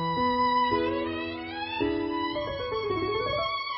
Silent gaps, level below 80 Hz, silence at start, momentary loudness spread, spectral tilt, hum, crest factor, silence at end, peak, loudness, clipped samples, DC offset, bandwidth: none; -50 dBFS; 0 s; 8 LU; -9.5 dB/octave; none; 14 dB; 0 s; -14 dBFS; -28 LUFS; under 0.1%; under 0.1%; 5.8 kHz